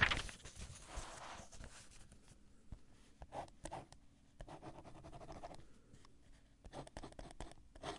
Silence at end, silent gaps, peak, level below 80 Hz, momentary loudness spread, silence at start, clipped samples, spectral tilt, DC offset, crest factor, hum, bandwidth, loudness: 0 s; none; -18 dBFS; -58 dBFS; 15 LU; 0 s; under 0.1%; -3 dB/octave; under 0.1%; 32 dB; none; 11.5 kHz; -51 LUFS